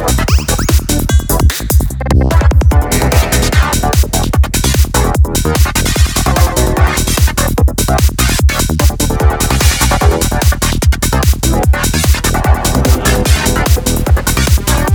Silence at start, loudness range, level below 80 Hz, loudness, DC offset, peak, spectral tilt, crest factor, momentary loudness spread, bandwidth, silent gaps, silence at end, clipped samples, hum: 0 s; 0 LU; -12 dBFS; -11 LUFS; under 0.1%; 0 dBFS; -4.5 dB/octave; 10 dB; 2 LU; over 20 kHz; none; 0 s; under 0.1%; none